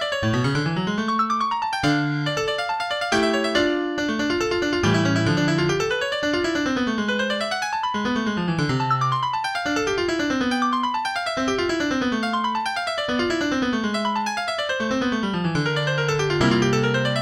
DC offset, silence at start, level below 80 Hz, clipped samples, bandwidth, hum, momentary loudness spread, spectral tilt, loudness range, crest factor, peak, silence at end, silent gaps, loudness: under 0.1%; 0 s; -48 dBFS; under 0.1%; 15 kHz; none; 4 LU; -5 dB/octave; 2 LU; 16 dB; -6 dBFS; 0 s; none; -22 LUFS